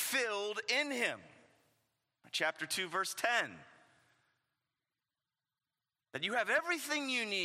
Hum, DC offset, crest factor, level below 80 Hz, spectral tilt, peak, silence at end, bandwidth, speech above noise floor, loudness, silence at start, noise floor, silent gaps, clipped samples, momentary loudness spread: none; under 0.1%; 24 dB; under -90 dBFS; -1.5 dB/octave; -16 dBFS; 0 s; 16 kHz; over 54 dB; -35 LUFS; 0 s; under -90 dBFS; none; under 0.1%; 7 LU